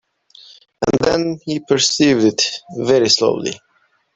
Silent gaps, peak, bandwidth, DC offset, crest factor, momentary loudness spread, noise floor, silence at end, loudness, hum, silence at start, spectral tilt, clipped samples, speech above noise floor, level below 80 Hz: none; 0 dBFS; 8.4 kHz; under 0.1%; 16 dB; 11 LU; -61 dBFS; 0.6 s; -16 LUFS; none; 0.8 s; -3.5 dB/octave; under 0.1%; 45 dB; -52 dBFS